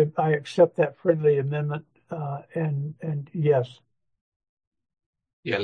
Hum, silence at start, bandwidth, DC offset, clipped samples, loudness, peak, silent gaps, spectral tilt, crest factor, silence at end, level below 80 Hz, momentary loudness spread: none; 0 s; 9.4 kHz; under 0.1%; under 0.1%; -25 LUFS; -6 dBFS; 4.21-4.40 s, 4.49-4.57 s, 4.67-4.72 s, 5.06-5.13 s, 5.33-5.43 s; -8 dB/octave; 20 dB; 0 s; -72 dBFS; 14 LU